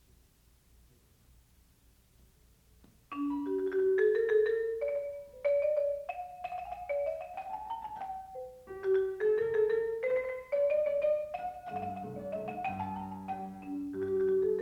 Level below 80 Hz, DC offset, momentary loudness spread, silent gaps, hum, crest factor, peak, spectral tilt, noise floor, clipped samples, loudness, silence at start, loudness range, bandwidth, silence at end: -66 dBFS; under 0.1%; 13 LU; none; none; 16 dB; -18 dBFS; -7.5 dB/octave; -65 dBFS; under 0.1%; -33 LUFS; 3.1 s; 7 LU; 13.5 kHz; 0 s